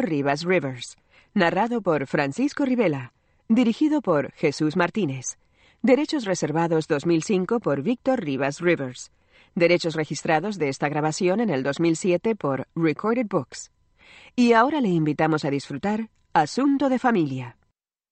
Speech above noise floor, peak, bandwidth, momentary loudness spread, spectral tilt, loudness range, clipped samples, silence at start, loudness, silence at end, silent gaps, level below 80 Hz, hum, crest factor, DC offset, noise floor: 49 dB; -6 dBFS; 8.8 kHz; 9 LU; -5.5 dB/octave; 1 LU; under 0.1%; 0 s; -23 LUFS; 0.6 s; none; -64 dBFS; none; 18 dB; under 0.1%; -72 dBFS